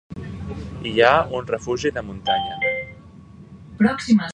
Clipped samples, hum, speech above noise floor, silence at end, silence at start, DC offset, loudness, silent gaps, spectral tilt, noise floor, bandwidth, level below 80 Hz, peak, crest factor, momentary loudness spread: under 0.1%; none; 23 dB; 0 s; 0.1 s; under 0.1%; -21 LUFS; none; -5.5 dB/octave; -43 dBFS; 9.4 kHz; -44 dBFS; 0 dBFS; 22 dB; 17 LU